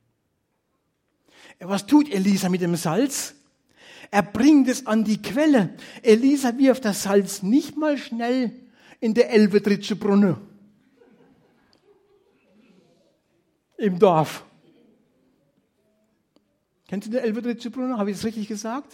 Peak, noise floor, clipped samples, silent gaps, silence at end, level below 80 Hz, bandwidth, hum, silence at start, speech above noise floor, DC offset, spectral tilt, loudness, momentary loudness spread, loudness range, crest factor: -2 dBFS; -73 dBFS; under 0.1%; none; 0.1 s; -66 dBFS; 16.5 kHz; none; 1.6 s; 52 dB; under 0.1%; -5.5 dB/octave; -21 LUFS; 12 LU; 10 LU; 20 dB